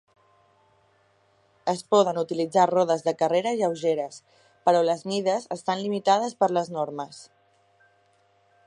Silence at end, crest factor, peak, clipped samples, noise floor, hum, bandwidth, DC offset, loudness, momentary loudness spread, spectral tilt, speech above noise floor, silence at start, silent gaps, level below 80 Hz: 1.45 s; 20 dB; -6 dBFS; under 0.1%; -64 dBFS; none; 11.5 kHz; under 0.1%; -24 LUFS; 10 LU; -5 dB/octave; 40 dB; 1.65 s; none; -78 dBFS